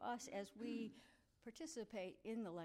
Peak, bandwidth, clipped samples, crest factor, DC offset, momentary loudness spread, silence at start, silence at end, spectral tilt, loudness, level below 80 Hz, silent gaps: -36 dBFS; 15.5 kHz; under 0.1%; 14 dB; under 0.1%; 11 LU; 0 s; 0 s; -4.5 dB/octave; -51 LUFS; -82 dBFS; none